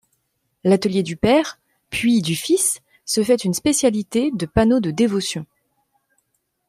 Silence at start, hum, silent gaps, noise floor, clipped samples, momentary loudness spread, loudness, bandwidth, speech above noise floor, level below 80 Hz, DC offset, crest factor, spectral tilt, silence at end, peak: 0.65 s; none; none; -71 dBFS; under 0.1%; 8 LU; -19 LUFS; 15.5 kHz; 52 dB; -46 dBFS; under 0.1%; 18 dB; -4.5 dB/octave; 1.25 s; -2 dBFS